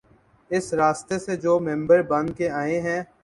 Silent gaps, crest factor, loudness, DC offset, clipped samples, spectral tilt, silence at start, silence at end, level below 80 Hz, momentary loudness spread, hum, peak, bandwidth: none; 18 dB; -23 LUFS; under 0.1%; under 0.1%; -6 dB/octave; 0.5 s; 0.2 s; -56 dBFS; 9 LU; none; -6 dBFS; 11.5 kHz